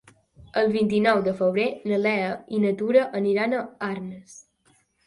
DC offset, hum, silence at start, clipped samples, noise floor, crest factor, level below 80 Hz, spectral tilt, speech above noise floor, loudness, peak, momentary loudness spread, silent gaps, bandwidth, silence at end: under 0.1%; none; 0.4 s; under 0.1%; -64 dBFS; 18 dB; -64 dBFS; -6.5 dB/octave; 41 dB; -24 LUFS; -6 dBFS; 10 LU; none; 11.5 kHz; 0.65 s